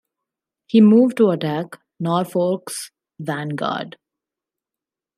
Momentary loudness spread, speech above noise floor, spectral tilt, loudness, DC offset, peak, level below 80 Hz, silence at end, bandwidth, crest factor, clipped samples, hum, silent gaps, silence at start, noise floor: 19 LU; 70 dB; -6.5 dB/octave; -19 LUFS; under 0.1%; -4 dBFS; -72 dBFS; 1.25 s; 14.5 kHz; 18 dB; under 0.1%; none; none; 0.75 s; -88 dBFS